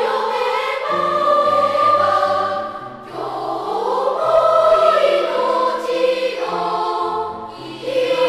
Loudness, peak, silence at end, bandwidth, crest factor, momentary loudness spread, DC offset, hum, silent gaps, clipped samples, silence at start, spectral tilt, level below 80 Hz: -17 LUFS; -2 dBFS; 0 s; 13.5 kHz; 16 dB; 14 LU; under 0.1%; none; none; under 0.1%; 0 s; -4 dB/octave; -58 dBFS